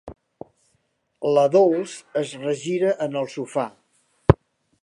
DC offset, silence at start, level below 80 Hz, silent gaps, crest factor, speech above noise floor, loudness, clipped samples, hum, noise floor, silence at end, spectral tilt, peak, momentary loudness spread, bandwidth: under 0.1%; 0.05 s; -42 dBFS; none; 22 dB; 48 dB; -22 LUFS; under 0.1%; none; -70 dBFS; 0.5 s; -7 dB/octave; 0 dBFS; 11 LU; 11.5 kHz